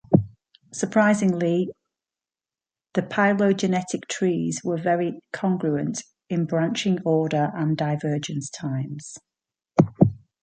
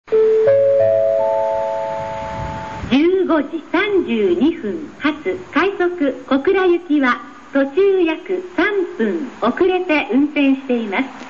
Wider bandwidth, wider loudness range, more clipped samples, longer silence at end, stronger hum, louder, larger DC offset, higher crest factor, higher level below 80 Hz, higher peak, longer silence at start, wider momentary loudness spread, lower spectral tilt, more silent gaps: first, 9.4 kHz vs 7.4 kHz; about the same, 2 LU vs 2 LU; neither; first, 0.3 s vs 0 s; neither; second, -24 LUFS vs -17 LUFS; second, under 0.1% vs 0.5%; first, 22 dB vs 14 dB; second, -58 dBFS vs -46 dBFS; about the same, -2 dBFS vs -2 dBFS; about the same, 0.1 s vs 0.05 s; about the same, 10 LU vs 9 LU; about the same, -6 dB/octave vs -6.5 dB/octave; neither